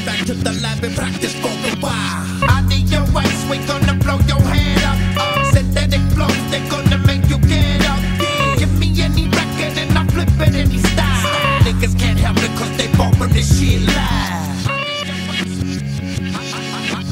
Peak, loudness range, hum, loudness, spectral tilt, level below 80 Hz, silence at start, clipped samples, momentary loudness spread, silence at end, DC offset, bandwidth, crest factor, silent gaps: 0 dBFS; 3 LU; none; -16 LUFS; -5 dB/octave; -24 dBFS; 0 s; under 0.1%; 7 LU; 0 s; under 0.1%; 16 kHz; 14 dB; none